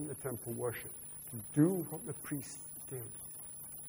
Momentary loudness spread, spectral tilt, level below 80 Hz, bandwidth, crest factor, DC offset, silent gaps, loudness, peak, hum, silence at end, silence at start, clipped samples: 13 LU; -6 dB/octave; -68 dBFS; over 20 kHz; 22 dB; under 0.1%; none; -39 LUFS; -18 dBFS; none; 0 s; 0 s; under 0.1%